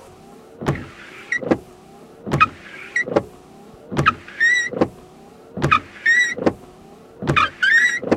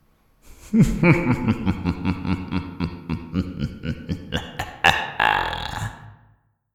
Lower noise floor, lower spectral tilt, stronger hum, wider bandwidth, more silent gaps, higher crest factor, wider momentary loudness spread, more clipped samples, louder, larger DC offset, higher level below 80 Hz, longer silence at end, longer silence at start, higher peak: second, -44 dBFS vs -60 dBFS; second, -4.5 dB/octave vs -6 dB/octave; neither; second, 15 kHz vs 17 kHz; neither; about the same, 20 dB vs 22 dB; first, 20 LU vs 13 LU; neither; first, -19 LUFS vs -23 LUFS; neither; second, -48 dBFS vs -38 dBFS; second, 0 s vs 0.6 s; first, 0.6 s vs 0.45 s; about the same, 0 dBFS vs 0 dBFS